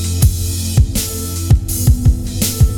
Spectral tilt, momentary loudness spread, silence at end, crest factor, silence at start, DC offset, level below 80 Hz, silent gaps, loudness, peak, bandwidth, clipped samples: -5 dB/octave; 6 LU; 0 s; 14 dB; 0 s; under 0.1%; -18 dBFS; none; -15 LUFS; 0 dBFS; over 20 kHz; under 0.1%